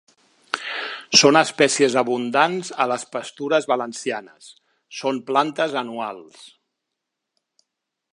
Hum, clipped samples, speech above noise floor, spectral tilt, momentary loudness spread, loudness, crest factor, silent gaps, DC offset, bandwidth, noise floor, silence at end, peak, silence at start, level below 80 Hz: none; under 0.1%; 60 dB; -2.5 dB/octave; 15 LU; -20 LUFS; 22 dB; none; under 0.1%; 11.5 kHz; -81 dBFS; 1.65 s; 0 dBFS; 0.55 s; -76 dBFS